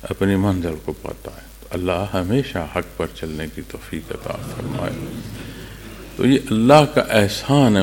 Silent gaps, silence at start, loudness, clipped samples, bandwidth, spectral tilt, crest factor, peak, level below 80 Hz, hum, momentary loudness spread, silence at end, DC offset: none; 0 s; -20 LUFS; under 0.1%; 17 kHz; -6 dB/octave; 20 dB; 0 dBFS; -40 dBFS; none; 20 LU; 0 s; under 0.1%